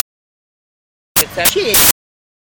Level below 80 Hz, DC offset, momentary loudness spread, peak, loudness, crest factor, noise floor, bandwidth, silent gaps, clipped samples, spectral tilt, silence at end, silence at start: -42 dBFS; under 0.1%; 10 LU; 0 dBFS; -11 LUFS; 18 dB; under -90 dBFS; over 20 kHz; none; under 0.1%; -1 dB/octave; 0.55 s; 1.15 s